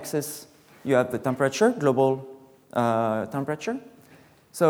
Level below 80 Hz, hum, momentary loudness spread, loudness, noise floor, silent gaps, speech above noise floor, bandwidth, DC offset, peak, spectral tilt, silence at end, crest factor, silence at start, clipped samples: -70 dBFS; none; 15 LU; -25 LUFS; -54 dBFS; none; 30 dB; over 20 kHz; under 0.1%; -6 dBFS; -5.5 dB/octave; 0 s; 18 dB; 0 s; under 0.1%